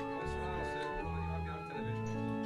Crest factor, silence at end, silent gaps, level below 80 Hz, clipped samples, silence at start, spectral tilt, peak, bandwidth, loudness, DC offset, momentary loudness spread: 12 dB; 0 s; none; -48 dBFS; under 0.1%; 0 s; -7 dB/octave; -26 dBFS; 12.5 kHz; -39 LUFS; under 0.1%; 2 LU